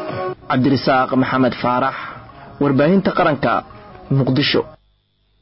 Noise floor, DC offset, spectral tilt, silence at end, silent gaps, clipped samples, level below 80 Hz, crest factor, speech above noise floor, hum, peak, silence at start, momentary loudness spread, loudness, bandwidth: -61 dBFS; under 0.1%; -10.5 dB/octave; 0.65 s; none; under 0.1%; -48 dBFS; 12 dB; 45 dB; none; -6 dBFS; 0 s; 11 LU; -17 LUFS; 5.8 kHz